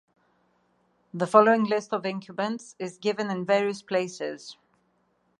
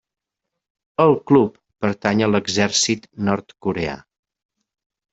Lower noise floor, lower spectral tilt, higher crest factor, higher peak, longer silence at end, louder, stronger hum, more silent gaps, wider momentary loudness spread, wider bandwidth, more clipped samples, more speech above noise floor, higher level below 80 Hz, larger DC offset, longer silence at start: second, -70 dBFS vs -82 dBFS; about the same, -5.5 dB/octave vs -4.5 dB/octave; about the same, 24 dB vs 20 dB; about the same, -4 dBFS vs -2 dBFS; second, 0.85 s vs 1.15 s; second, -26 LUFS vs -19 LUFS; neither; neither; first, 17 LU vs 10 LU; first, 11.5 kHz vs 8.2 kHz; neither; second, 44 dB vs 63 dB; second, -78 dBFS vs -56 dBFS; neither; first, 1.15 s vs 1 s